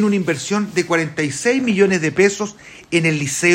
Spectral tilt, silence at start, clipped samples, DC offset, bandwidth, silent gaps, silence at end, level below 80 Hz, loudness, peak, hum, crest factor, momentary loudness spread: -4.5 dB/octave; 0 s; under 0.1%; under 0.1%; 16 kHz; none; 0 s; -56 dBFS; -18 LUFS; -2 dBFS; none; 16 dB; 5 LU